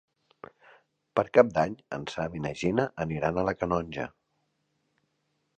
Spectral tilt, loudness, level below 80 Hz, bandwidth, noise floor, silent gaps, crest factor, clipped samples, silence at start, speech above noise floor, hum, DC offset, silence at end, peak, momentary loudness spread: -6.5 dB/octave; -28 LUFS; -56 dBFS; 9 kHz; -76 dBFS; none; 26 dB; under 0.1%; 1.15 s; 49 dB; none; under 0.1%; 1.5 s; -4 dBFS; 14 LU